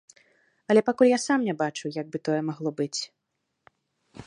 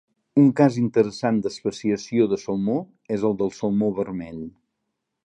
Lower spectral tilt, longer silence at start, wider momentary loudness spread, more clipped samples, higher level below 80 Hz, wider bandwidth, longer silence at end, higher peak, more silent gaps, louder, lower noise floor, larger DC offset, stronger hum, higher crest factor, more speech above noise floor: second, -5 dB/octave vs -7.5 dB/octave; first, 0.7 s vs 0.35 s; about the same, 12 LU vs 11 LU; neither; second, -72 dBFS vs -60 dBFS; first, 11 kHz vs 9.8 kHz; second, 0.05 s vs 0.75 s; about the same, -6 dBFS vs -4 dBFS; neither; about the same, -25 LUFS vs -23 LUFS; about the same, -80 dBFS vs -79 dBFS; neither; neither; about the same, 20 dB vs 20 dB; about the same, 55 dB vs 57 dB